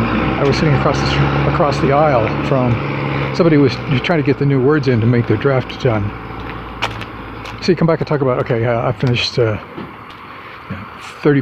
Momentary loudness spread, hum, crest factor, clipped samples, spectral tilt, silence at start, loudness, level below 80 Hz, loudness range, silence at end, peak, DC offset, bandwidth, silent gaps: 16 LU; none; 14 dB; under 0.1%; -7 dB/octave; 0 s; -15 LUFS; -34 dBFS; 4 LU; 0 s; 0 dBFS; under 0.1%; 8.4 kHz; none